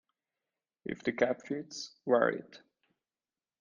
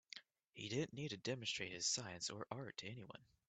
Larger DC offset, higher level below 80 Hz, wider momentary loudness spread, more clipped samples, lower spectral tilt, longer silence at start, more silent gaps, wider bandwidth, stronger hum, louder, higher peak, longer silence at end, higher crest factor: neither; about the same, -76 dBFS vs -80 dBFS; second, 14 LU vs 17 LU; neither; first, -5 dB/octave vs -3 dB/octave; first, 0.85 s vs 0.15 s; second, none vs 0.49-0.53 s; second, 7.4 kHz vs 9 kHz; neither; first, -33 LUFS vs -45 LUFS; first, -12 dBFS vs -28 dBFS; first, 1.05 s vs 0.25 s; about the same, 24 dB vs 20 dB